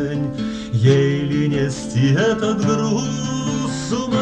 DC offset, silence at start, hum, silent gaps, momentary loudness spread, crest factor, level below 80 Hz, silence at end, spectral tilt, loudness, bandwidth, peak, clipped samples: under 0.1%; 0 s; none; none; 7 LU; 16 dB; -44 dBFS; 0 s; -6 dB/octave; -19 LUFS; 9.6 kHz; -2 dBFS; under 0.1%